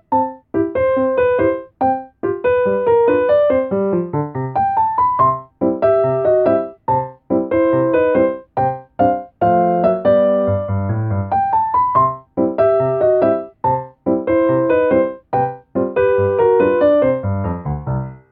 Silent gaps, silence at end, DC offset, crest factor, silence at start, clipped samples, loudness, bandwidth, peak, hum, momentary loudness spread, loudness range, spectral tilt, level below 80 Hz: none; 0.15 s; under 0.1%; 14 dB; 0.1 s; under 0.1%; -16 LUFS; 4.3 kHz; -2 dBFS; none; 7 LU; 1 LU; -7.5 dB/octave; -44 dBFS